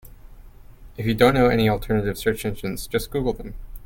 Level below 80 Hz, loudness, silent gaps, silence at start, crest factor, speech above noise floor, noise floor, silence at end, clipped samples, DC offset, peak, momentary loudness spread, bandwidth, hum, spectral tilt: -36 dBFS; -22 LUFS; none; 0.05 s; 20 dB; 22 dB; -44 dBFS; 0 s; under 0.1%; under 0.1%; -2 dBFS; 12 LU; 17 kHz; none; -6 dB/octave